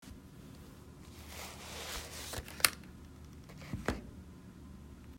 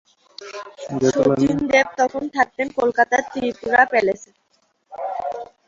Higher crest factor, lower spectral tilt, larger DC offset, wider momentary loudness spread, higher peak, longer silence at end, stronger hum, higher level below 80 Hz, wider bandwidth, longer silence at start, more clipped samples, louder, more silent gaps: first, 38 dB vs 20 dB; second, -2 dB/octave vs -5 dB/octave; neither; first, 23 LU vs 18 LU; about the same, -4 dBFS vs -2 dBFS; second, 0 s vs 0.25 s; neither; about the same, -54 dBFS vs -56 dBFS; first, 16 kHz vs 7.8 kHz; second, 0 s vs 0.4 s; neither; second, -37 LUFS vs -19 LUFS; neither